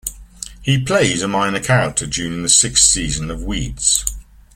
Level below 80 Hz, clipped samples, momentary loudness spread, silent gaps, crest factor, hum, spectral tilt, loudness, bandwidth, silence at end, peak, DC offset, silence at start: -34 dBFS; under 0.1%; 14 LU; none; 18 dB; none; -2.5 dB/octave; -15 LUFS; 17 kHz; 0.35 s; 0 dBFS; under 0.1%; 0.05 s